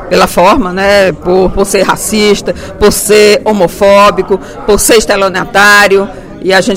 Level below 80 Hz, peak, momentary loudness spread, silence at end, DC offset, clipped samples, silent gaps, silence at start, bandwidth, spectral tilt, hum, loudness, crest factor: -26 dBFS; 0 dBFS; 8 LU; 0 s; under 0.1%; 3%; none; 0 s; 16.5 kHz; -3.5 dB/octave; none; -7 LUFS; 8 dB